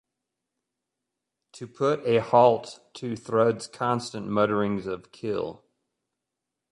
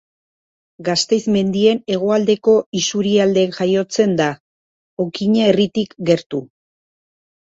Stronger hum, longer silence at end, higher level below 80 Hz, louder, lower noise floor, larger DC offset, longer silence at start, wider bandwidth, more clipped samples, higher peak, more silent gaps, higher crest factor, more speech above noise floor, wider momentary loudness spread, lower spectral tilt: neither; about the same, 1.2 s vs 1.1 s; second, -64 dBFS vs -58 dBFS; second, -25 LUFS vs -17 LUFS; second, -85 dBFS vs under -90 dBFS; neither; first, 1.55 s vs 0.8 s; first, 11.5 kHz vs 8 kHz; neither; second, -6 dBFS vs -2 dBFS; second, none vs 2.66-2.72 s, 4.40-4.97 s, 6.26-6.30 s; first, 22 dB vs 16 dB; second, 60 dB vs over 74 dB; first, 17 LU vs 10 LU; about the same, -6 dB/octave vs -5 dB/octave